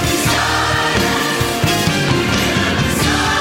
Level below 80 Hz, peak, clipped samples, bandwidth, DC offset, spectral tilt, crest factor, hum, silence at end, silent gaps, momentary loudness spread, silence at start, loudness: -32 dBFS; -2 dBFS; under 0.1%; 16.5 kHz; under 0.1%; -3.5 dB/octave; 14 dB; none; 0 s; none; 1 LU; 0 s; -15 LUFS